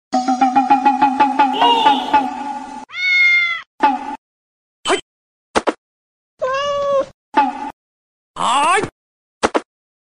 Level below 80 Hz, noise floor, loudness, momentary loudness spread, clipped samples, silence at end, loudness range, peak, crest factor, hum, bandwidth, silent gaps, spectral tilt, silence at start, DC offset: -54 dBFS; under -90 dBFS; -16 LUFS; 14 LU; under 0.1%; 0.45 s; 8 LU; -2 dBFS; 16 dB; none; 10.5 kHz; 3.67-3.78 s, 4.18-4.83 s, 5.02-5.54 s, 5.78-6.37 s, 7.14-7.32 s, 7.73-8.34 s, 8.92-9.41 s; -2.5 dB/octave; 0.1 s; under 0.1%